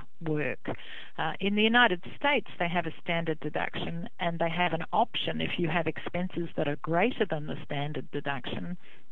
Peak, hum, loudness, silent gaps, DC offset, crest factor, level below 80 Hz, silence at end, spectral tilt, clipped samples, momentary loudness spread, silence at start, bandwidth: -10 dBFS; none; -30 LUFS; none; 2%; 22 dB; -62 dBFS; 0.35 s; -7.5 dB/octave; under 0.1%; 10 LU; 0 s; 6.2 kHz